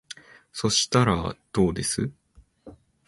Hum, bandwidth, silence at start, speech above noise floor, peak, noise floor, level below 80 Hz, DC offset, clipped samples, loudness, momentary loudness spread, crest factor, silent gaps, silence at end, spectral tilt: none; 11.5 kHz; 0.1 s; 29 dB; -8 dBFS; -53 dBFS; -46 dBFS; under 0.1%; under 0.1%; -24 LUFS; 19 LU; 18 dB; none; 0.35 s; -4 dB/octave